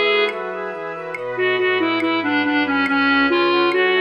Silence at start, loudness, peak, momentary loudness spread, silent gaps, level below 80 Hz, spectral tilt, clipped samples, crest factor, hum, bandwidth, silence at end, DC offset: 0 s; -18 LUFS; -6 dBFS; 11 LU; none; -64 dBFS; -5.5 dB/octave; under 0.1%; 14 dB; none; 8.8 kHz; 0 s; under 0.1%